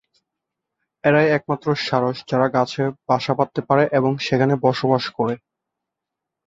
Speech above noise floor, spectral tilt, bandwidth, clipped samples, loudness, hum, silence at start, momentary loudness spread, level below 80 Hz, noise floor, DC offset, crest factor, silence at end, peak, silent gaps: 64 dB; -7 dB/octave; 7.8 kHz; under 0.1%; -20 LUFS; none; 1.05 s; 6 LU; -60 dBFS; -84 dBFS; under 0.1%; 18 dB; 1.1 s; -2 dBFS; none